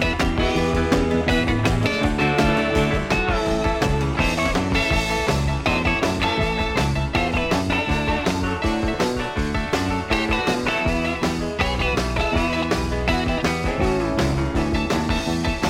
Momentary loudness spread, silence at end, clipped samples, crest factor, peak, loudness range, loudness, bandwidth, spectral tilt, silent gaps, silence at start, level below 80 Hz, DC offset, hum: 3 LU; 0 s; under 0.1%; 16 dB; -4 dBFS; 2 LU; -21 LUFS; 16.5 kHz; -5.5 dB/octave; none; 0 s; -30 dBFS; under 0.1%; none